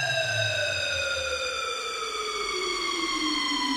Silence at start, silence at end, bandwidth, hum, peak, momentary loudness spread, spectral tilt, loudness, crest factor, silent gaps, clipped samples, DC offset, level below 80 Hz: 0 s; 0 s; 16.5 kHz; none; -14 dBFS; 4 LU; -2 dB/octave; -27 LUFS; 14 dB; none; under 0.1%; under 0.1%; -56 dBFS